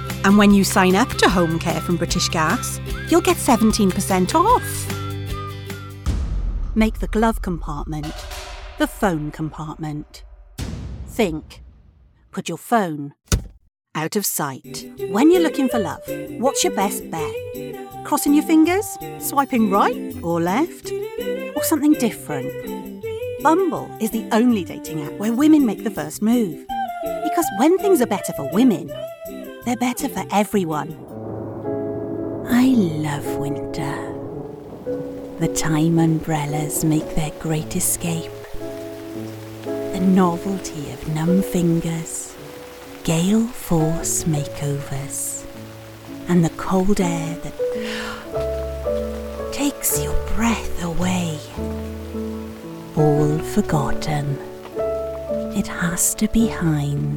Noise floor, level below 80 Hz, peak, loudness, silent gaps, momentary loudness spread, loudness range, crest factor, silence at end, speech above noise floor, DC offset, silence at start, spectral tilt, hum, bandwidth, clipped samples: -51 dBFS; -36 dBFS; -2 dBFS; -21 LUFS; none; 15 LU; 6 LU; 18 dB; 0 s; 32 dB; under 0.1%; 0 s; -5 dB/octave; none; 19.5 kHz; under 0.1%